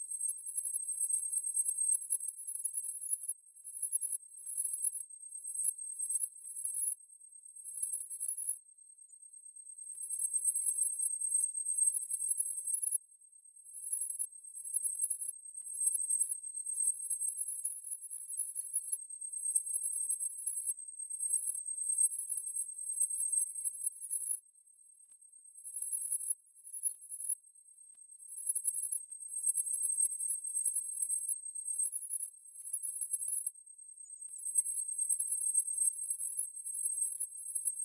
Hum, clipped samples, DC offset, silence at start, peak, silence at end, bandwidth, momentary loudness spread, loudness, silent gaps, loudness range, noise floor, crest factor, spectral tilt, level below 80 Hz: none; under 0.1%; under 0.1%; 0 s; -16 dBFS; 0 s; 12 kHz; 13 LU; -33 LUFS; none; 4 LU; -63 dBFS; 20 dB; 5 dB/octave; under -90 dBFS